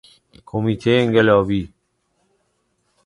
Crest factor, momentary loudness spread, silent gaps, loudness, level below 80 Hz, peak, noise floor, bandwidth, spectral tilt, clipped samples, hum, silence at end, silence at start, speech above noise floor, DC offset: 20 dB; 13 LU; none; -18 LUFS; -48 dBFS; -2 dBFS; -68 dBFS; 11 kHz; -7.5 dB/octave; under 0.1%; none; 1.4 s; 0.55 s; 51 dB; under 0.1%